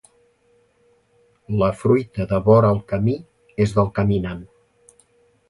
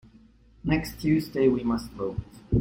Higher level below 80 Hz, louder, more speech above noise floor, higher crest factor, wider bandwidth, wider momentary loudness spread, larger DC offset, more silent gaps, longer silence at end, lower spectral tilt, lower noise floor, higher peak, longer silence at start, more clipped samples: about the same, -44 dBFS vs -42 dBFS; first, -20 LUFS vs -27 LUFS; first, 42 dB vs 30 dB; about the same, 20 dB vs 18 dB; second, 11.5 kHz vs 16.5 kHz; first, 15 LU vs 10 LU; neither; neither; first, 1.05 s vs 0 s; about the same, -8.5 dB/octave vs -7.5 dB/octave; first, -60 dBFS vs -55 dBFS; first, -2 dBFS vs -10 dBFS; first, 1.5 s vs 0.65 s; neither